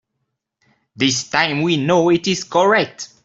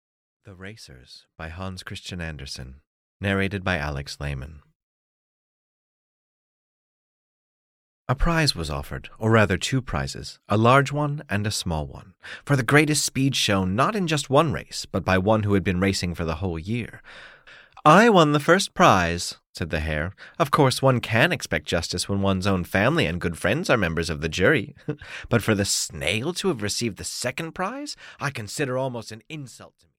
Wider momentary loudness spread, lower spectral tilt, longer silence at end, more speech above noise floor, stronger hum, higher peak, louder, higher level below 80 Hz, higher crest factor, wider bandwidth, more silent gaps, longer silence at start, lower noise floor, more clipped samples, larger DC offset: second, 4 LU vs 18 LU; about the same, -4 dB/octave vs -4.5 dB/octave; about the same, 0.2 s vs 0.3 s; first, 58 dB vs 26 dB; neither; about the same, -2 dBFS vs -4 dBFS; first, -17 LUFS vs -23 LUFS; second, -60 dBFS vs -42 dBFS; about the same, 16 dB vs 20 dB; second, 8 kHz vs 16.5 kHz; second, none vs 2.87-3.20 s, 4.75-8.05 s, 19.49-19.53 s; first, 1 s vs 0.45 s; first, -75 dBFS vs -49 dBFS; neither; neither